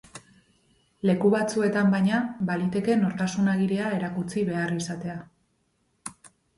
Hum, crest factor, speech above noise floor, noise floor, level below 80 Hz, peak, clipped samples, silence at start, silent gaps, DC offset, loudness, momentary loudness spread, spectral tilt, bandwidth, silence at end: none; 16 dB; 46 dB; -71 dBFS; -62 dBFS; -10 dBFS; under 0.1%; 0.15 s; none; under 0.1%; -25 LUFS; 15 LU; -6.5 dB/octave; 11.5 kHz; 0.3 s